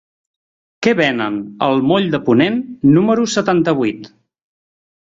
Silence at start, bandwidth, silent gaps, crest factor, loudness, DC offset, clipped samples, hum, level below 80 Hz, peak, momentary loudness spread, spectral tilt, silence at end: 0.8 s; 7.8 kHz; none; 16 dB; -15 LUFS; under 0.1%; under 0.1%; none; -54 dBFS; 0 dBFS; 7 LU; -6 dB/octave; 1 s